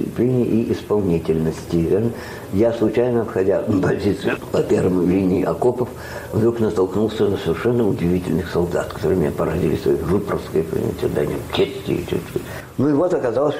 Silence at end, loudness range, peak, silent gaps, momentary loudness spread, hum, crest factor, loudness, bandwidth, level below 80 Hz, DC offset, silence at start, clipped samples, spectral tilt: 0 s; 2 LU; -8 dBFS; none; 6 LU; none; 12 dB; -20 LUFS; 16 kHz; -42 dBFS; under 0.1%; 0 s; under 0.1%; -7.5 dB/octave